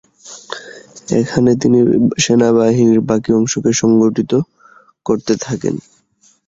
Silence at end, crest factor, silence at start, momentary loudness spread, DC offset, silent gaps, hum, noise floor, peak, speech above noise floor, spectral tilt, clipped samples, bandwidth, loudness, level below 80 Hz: 0.7 s; 14 dB; 0.25 s; 18 LU; under 0.1%; none; none; -54 dBFS; 0 dBFS; 41 dB; -5.5 dB/octave; under 0.1%; 7.8 kHz; -14 LUFS; -48 dBFS